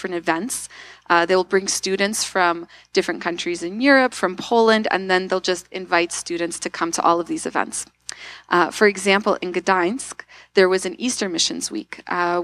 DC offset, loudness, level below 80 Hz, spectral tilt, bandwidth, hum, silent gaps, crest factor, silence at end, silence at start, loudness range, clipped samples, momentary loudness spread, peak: under 0.1%; -20 LUFS; -60 dBFS; -3 dB/octave; 14 kHz; none; none; 20 dB; 0 s; 0 s; 2 LU; under 0.1%; 12 LU; -2 dBFS